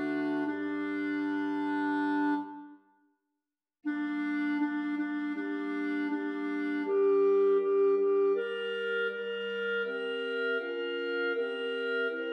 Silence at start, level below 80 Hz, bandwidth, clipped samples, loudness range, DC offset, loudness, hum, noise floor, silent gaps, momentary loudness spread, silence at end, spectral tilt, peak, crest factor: 0 s; under -90 dBFS; 6 kHz; under 0.1%; 6 LU; under 0.1%; -31 LUFS; none; -88 dBFS; none; 8 LU; 0 s; -6 dB/octave; -20 dBFS; 12 dB